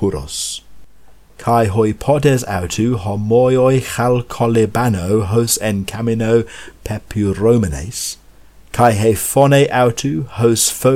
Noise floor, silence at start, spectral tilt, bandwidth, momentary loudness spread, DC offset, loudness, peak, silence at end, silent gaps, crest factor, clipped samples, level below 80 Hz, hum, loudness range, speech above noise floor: -43 dBFS; 0 s; -5 dB/octave; 17 kHz; 11 LU; under 0.1%; -15 LUFS; 0 dBFS; 0 s; none; 16 dB; under 0.1%; -38 dBFS; none; 3 LU; 29 dB